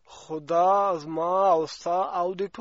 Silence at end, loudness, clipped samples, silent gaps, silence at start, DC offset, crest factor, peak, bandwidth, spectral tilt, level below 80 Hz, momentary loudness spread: 0 s; -24 LUFS; under 0.1%; none; 0.1 s; under 0.1%; 14 dB; -10 dBFS; 8 kHz; -4.5 dB/octave; -68 dBFS; 8 LU